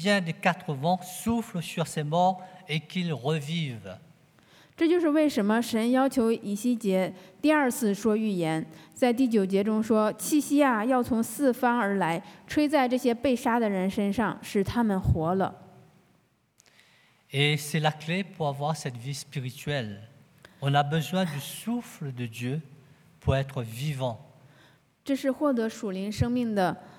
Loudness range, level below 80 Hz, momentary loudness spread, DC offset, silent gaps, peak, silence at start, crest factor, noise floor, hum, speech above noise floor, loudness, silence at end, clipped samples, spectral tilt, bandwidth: 6 LU; -54 dBFS; 10 LU; under 0.1%; none; -8 dBFS; 0 s; 20 dB; -66 dBFS; none; 40 dB; -27 LUFS; 0.05 s; under 0.1%; -5.5 dB/octave; over 20 kHz